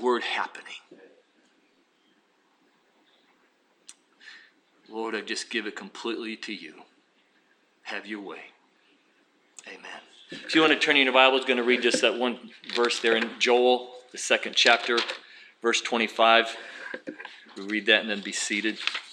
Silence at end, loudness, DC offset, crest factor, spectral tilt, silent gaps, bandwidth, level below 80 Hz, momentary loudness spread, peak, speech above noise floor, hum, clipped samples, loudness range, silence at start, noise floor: 0 s; -24 LUFS; under 0.1%; 24 dB; -1.5 dB/octave; none; 11.5 kHz; under -90 dBFS; 22 LU; -4 dBFS; 40 dB; none; under 0.1%; 19 LU; 0 s; -66 dBFS